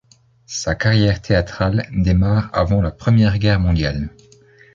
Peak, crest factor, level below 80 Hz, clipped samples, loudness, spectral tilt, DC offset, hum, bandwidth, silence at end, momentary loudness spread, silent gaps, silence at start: -2 dBFS; 16 dB; -30 dBFS; under 0.1%; -18 LUFS; -6.5 dB/octave; under 0.1%; none; 7.6 kHz; 0.65 s; 8 LU; none; 0.5 s